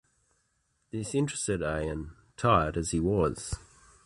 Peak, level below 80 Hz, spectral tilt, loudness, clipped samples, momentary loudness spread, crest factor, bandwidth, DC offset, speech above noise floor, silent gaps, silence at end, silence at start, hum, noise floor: -10 dBFS; -46 dBFS; -5.5 dB/octave; -30 LUFS; under 0.1%; 14 LU; 22 dB; 11.5 kHz; under 0.1%; 46 dB; none; 0.45 s; 0.95 s; none; -74 dBFS